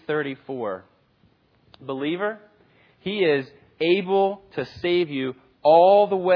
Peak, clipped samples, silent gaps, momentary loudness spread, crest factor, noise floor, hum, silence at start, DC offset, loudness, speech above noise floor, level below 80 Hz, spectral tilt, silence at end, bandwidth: -4 dBFS; under 0.1%; none; 18 LU; 18 dB; -62 dBFS; none; 0.1 s; under 0.1%; -22 LUFS; 40 dB; -66 dBFS; -8 dB/octave; 0 s; 5.4 kHz